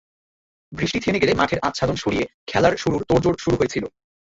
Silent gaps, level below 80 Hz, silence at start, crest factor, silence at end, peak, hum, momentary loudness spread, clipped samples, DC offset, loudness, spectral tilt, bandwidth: 2.34-2.47 s; -44 dBFS; 0.7 s; 18 dB; 0.45 s; -4 dBFS; none; 8 LU; under 0.1%; under 0.1%; -21 LUFS; -5.5 dB/octave; 8 kHz